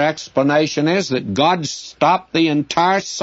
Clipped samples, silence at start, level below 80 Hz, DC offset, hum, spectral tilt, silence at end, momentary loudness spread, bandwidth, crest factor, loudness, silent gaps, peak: under 0.1%; 0 s; -58 dBFS; under 0.1%; none; -4.5 dB/octave; 0 s; 3 LU; 8 kHz; 16 dB; -17 LUFS; none; -2 dBFS